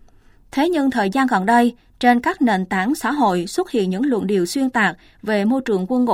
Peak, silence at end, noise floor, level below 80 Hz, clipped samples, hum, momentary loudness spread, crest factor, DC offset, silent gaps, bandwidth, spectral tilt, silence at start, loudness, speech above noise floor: -2 dBFS; 0 s; -49 dBFS; -52 dBFS; under 0.1%; none; 5 LU; 16 dB; under 0.1%; none; 16 kHz; -5.5 dB/octave; 0.55 s; -19 LUFS; 31 dB